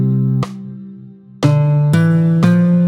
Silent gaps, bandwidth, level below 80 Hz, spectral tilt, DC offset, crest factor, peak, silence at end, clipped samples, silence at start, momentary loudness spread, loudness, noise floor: none; 11 kHz; -52 dBFS; -8.5 dB/octave; under 0.1%; 14 dB; 0 dBFS; 0 s; under 0.1%; 0 s; 19 LU; -14 LUFS; -37 dBFS